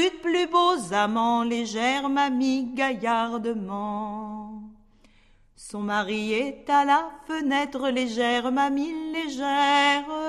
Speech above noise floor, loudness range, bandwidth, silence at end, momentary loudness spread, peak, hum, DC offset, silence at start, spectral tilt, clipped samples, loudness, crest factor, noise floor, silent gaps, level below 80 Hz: 33 dB; 7 LU; 12.5 kHz; 0 s; 11 LU; -8 dBFS; none; under 0.1%; 0 s; -3.5 dB/octave; under 0.1%; -24 LUFS; 16 dB; -57 dBFS; none; -60 dBFS